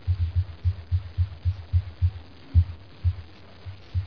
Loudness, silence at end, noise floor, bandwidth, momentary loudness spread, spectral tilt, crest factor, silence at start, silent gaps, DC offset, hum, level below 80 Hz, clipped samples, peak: -28 LUFS; 0 s; -44 dBFS; 5.2 kHz; 19 LU; -9 dB/octave; 18 dB; 0.05 s; none; 0.4%; none; -34 dBFS; under 0.1%; -8 dBFS